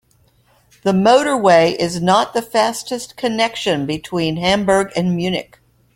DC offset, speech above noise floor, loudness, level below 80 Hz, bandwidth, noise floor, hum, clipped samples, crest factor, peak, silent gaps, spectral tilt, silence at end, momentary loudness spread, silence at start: under 0.1%; 40 dB; -16 LUFS; -50 dBFS; 16.5 kHz; -56 dBFS; none; under 0.1%; 16 dB; 0 dBFS; none; -5 dB/octave; 0.55 s; 10 LU; 0.85 s